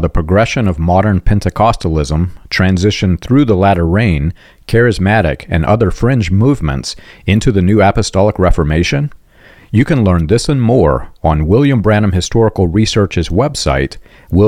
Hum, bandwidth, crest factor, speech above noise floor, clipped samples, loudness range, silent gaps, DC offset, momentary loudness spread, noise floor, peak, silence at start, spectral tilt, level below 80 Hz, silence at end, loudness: none; 11.5 kHz; 10 dB; 31 dB; under 0.1%; 1 LU; none; 0.4%; 6 LU; -42 dBFS; 0 dBFS; 0 s; -6.5 dB/octave; -24 dBFS; 0 s; -12 LUFS